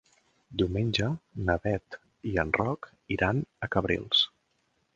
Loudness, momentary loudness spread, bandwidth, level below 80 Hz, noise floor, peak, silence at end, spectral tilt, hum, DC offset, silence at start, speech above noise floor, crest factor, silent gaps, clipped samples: -29 LUFS; 11 LU; 7.6 kHz; -48 dBFS; -73 dBFS; -8 dBFS; 0.7 s; -6 dB/octave; none; under 0.1%; 0.5 s; 45 dB; 22 dB; none; under 0.1%